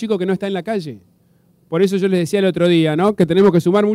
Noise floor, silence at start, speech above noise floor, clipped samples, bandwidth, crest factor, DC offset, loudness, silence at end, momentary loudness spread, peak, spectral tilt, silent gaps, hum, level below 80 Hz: -55 dBFS; 0 s; 40 dB; under 0.1%; 15 kHz; 12 dB; under 0.1%; -16 LUFS; 0 s; 11 LU; -4 dBFS; -7 dB/octave; none; none; -56 dBFS